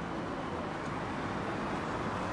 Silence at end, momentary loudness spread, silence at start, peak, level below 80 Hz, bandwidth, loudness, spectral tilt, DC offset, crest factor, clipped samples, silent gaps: 0 s; 2 LU; 0 s; -24 dBFS; -54 dBFS; 11.5 kHz; -36 LUFS; -6 dB/octave; under 0.1%; 12 dB; under 0.1%; none